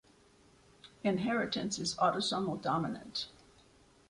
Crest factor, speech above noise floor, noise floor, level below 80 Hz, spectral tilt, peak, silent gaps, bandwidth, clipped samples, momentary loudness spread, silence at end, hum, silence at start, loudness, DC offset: 20 dB; 30 dB; -64 dBFS; -68 dBFS; -4 dB/octave; -16 dBFS; none; 11.5 kHz; under 0.1%; 9 LU; 0.8 s; none; 0.85 s; -34 LUFS; under 0.1%